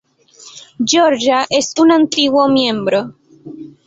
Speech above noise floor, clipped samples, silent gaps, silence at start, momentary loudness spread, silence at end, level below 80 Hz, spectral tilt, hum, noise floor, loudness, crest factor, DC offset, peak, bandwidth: 30 dB; under 0.1%; none; 0.45 s; 12 LU; 0.2 s; -58 dBFS; -3 dB/octave; none; -43 dBFS; -13 LUFS; 14 dB; under 0.1%; 0 dBFS; 8 kHz